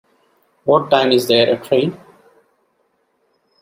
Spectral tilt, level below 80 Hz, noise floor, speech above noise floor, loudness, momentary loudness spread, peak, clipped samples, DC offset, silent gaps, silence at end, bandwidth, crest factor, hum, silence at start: -5 dB/octave; -64 dBFS; -64 dBFS; 50 dB; -15 LUFS; 7 LU; 0 dBFS; under 0.1%; under 0.1%; none; 1.65 s; 16 kHz; 18 dB; none; 0.65 s